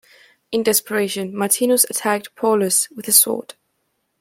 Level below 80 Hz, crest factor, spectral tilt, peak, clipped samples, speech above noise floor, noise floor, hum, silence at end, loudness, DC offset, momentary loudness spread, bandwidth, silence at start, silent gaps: -68 dBFS; 20 dB; -2 dB/octave; 0 dBFS; under 0.1%; 52 dB; -71 dBFS; none; 0.8 s; -17 LUFS; under 0.1%; 10 LU; 16.5 kHz; 0.5 s; none